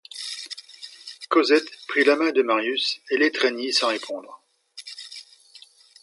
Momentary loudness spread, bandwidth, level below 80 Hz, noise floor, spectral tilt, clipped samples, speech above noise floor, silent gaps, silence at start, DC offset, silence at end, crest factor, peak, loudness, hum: 20 LU; 11.5 kHz; -84 dBFS; -51 dBFS; -1.5 dB/octave; under 0.1%; 29 dB; none; 0.15 s; under 0.1%; 0.8 s; 20 dB; -6 dBFS; -22 LUFS; none